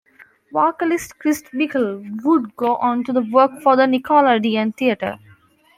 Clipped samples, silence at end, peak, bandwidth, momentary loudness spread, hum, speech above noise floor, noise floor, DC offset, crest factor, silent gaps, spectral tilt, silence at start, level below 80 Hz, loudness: under 0.1%; 0.6 s; -2 dBFS; 16 kHz; 9 LU; none; 34 dB; -52 dBFS; under 0.1%; 16 dB; none; -5 dB/octave; 0.55 s; -62 dBFS; -18 LUFS